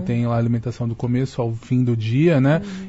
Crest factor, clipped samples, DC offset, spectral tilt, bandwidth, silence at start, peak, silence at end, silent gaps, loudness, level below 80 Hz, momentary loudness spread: 16 dB; under 0.1%; under 0.1%; -8.5 dB/octave; 8 kHz; 0 s; -4 dBFS; 0 s; none; -20 LUFS; -48 dBFS; 8 LU